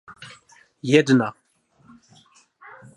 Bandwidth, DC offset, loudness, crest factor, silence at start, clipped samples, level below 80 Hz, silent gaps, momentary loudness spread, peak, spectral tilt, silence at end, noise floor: 11.5 kHz; under 0.1%; -20 LUFS; 24 dB; 0.1 s; under 0.1%; -70 dBFS; none; 26 LU; -2 dBFS; -6 dB/octave; 1.65 s; -57 dBFS